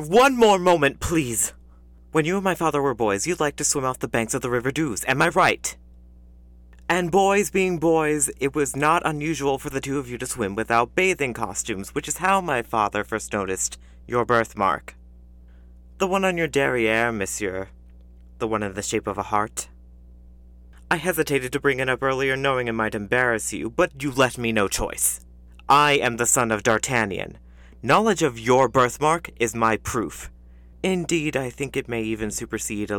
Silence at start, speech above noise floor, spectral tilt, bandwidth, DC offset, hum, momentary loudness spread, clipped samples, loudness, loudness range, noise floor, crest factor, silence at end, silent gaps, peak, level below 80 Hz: 0 s; 26 dB; -4 dB/octave; 19 kHz; under 0.1%; 60 Hz at -45 dBFS; 9 LU; under 0.1%; -22 LUFS; 5 LU; -48 dBFS; 18 dB; 0 s; none; -6 dBFS; -46 dBFS